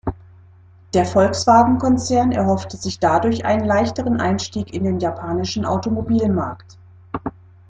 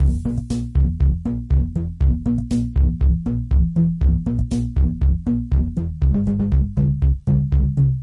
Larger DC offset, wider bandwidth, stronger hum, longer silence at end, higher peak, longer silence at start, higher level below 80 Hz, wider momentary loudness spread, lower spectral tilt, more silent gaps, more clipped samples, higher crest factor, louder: neither; first, 9.4 kHz vs 7.2 kHz; neither; first, 0.4 s vs 0 s; first, -2 dBFS vs -6 dBFS; about the same, 0.05 s vs 0 s; second, -46 dBFS vs -20 dBFS; first, 15 LU vs 4 LU; second, -6 dB/octave vs -9.5 dB/octave; neither; neither; first, 18 dB vs 12 dB; about the same, -18 LUFS vs -20 LUFS